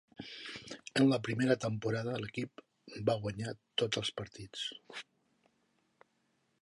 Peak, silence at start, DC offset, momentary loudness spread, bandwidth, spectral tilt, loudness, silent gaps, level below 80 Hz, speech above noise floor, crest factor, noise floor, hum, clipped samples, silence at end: -16 dBFS; 0.2 s; under 0.1%; 16 LU; 11.5 kHz; -5.5 dB/octave; -35 LUFS; none; -68 dBFS; 43 dB; 22 dB; -77 dBFS; none; under 0.1%; 1.6 s